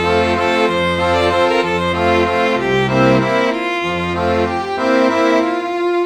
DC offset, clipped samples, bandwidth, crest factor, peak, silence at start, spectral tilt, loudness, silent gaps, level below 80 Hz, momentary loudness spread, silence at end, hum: under 0.1%; under 0.1%; 13.5 kHz; 14 dB; -2 dBFS; 0 s; -5.5 dB/octave; -15 LUFS; none; -40 dBFS; 5 LU; 0 s; none